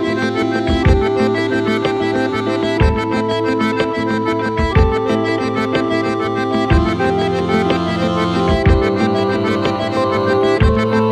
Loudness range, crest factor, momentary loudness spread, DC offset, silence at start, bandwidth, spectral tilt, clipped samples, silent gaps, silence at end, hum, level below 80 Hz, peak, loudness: 1 LU; 14 dB; 4 LU; under 0.1%; 0 s; 12 kHz; -7 dB/octave; under 0.1%; none; 0 s; none; -26 dBFS; 0 dBFS; -16 LUFS